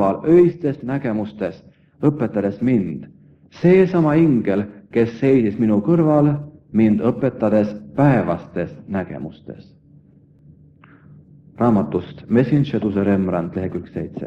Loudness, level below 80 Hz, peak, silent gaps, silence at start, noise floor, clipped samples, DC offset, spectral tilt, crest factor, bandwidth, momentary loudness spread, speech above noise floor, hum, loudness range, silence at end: -19 LUFS; -52 dBFS; -2 dBFS; none; 0 s; -50 dBFS; under 0.1%; under 0.1%; -10 dB/octave; 16 dB; 6.4 kHz; 13 LU; 32 dB; none; 9 LU; 0 s